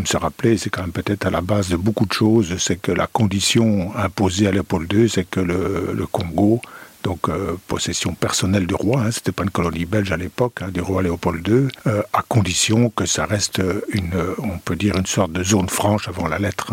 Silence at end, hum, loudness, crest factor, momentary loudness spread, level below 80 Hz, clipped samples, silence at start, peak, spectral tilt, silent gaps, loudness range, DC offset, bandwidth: 0 s; none; -20 LUFS; 16 dB; 7 LU; -42 dBFS; under 0.1%; 0 s; -4 dBFS; -5 dB/octave; none; 3 LU; under 0.1%; 16.5 kHz